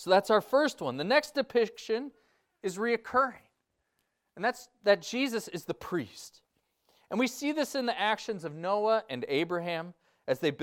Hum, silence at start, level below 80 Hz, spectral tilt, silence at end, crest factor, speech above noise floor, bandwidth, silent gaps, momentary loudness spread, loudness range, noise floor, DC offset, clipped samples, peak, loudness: none; 0 s; -74 dBFS; -4 dB/octave; 0 s; 20 dB; 50 dB; 17.5 kHz; none; 11 LU; 4 LU; -79 dBFS; under 0.1%; under 0.1%; -10 dBFS; -30 LUFS